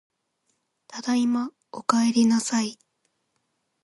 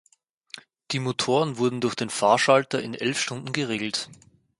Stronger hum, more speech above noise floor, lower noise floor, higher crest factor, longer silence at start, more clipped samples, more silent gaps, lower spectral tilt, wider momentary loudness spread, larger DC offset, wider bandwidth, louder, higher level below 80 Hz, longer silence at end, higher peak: neither; first, 52 dB vs 23 dB; first, -75 dBFS vs -48 dBFS; about the same, 22 dB vs 22 dB; about the same, 0.9 s vs 0.9 s; neither; neither; about the same, -3.5 dB/octave vs -4 dB/octave; second, 14 LU vs 20 LU; neither; about the same, 11.5 kHz vs 11.5 kHz; about the same, -24 LUFS vs -24 LUFS; second, -76 dBFS vs -68 dBFS; first, 1.1 s vs 0.45 s; about the same, -4 dBFS vs -4 dBFS